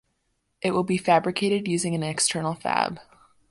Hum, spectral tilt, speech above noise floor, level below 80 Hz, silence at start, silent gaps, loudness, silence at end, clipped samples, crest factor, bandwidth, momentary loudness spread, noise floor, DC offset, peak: none; -4 dB/octave; 50 dB; -62 dBFS; 0.65 s; none; -24 LUFS; 0.5 s; under 0.1%; 20 dB; 11.5 kHz; 7 LU; -74 dBFS; under 0.1%; -6 dBFS